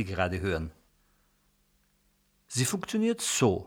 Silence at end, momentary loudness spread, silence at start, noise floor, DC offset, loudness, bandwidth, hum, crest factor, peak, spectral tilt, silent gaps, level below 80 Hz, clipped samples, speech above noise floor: 0 s; 9 LU; 0 s; -70 dBFS; under 0.1%; -29 LUFS; 19.5 kHz; none; 20 dB; -10 dBFS; -4 dB/octave; none; -52 dBFS; under 0.1%; 41 dB